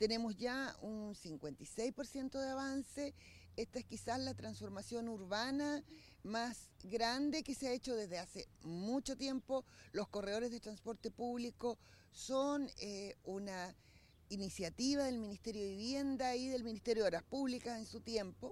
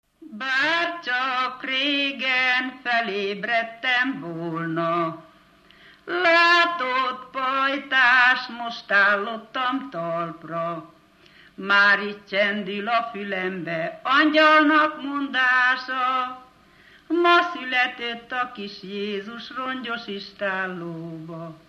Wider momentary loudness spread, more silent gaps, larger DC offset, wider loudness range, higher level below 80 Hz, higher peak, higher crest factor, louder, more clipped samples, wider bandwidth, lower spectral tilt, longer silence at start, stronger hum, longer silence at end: second, 10 LU vs 15 LU; neither; neither; about the same, 4 LU vs 6 LU; about the same, -66 dBFS vs -70 dBFS; second, -22 dBFS vs -6 dBFS; about the same, 20 dB vs 18 dB; second, -43 LUFS vs -22 LUFS; neither; first, 15 kHz vs 12.5 kHz; about the same, -4 dB/octave vs -4.5 dB/octave; second, 0 s vs 0.2 s; neither; about the same, 0 s vs 0.1 s